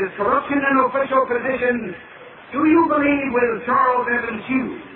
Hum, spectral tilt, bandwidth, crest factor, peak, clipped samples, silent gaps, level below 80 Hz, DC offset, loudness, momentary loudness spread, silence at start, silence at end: none; -10 dB/octave; 4.2 kHz; 16 dB; -4 dBFS; under 0.1%; none; -54 dBFS; under 0.1%; -19 LUFS; 7 LU; 0 s; 0 s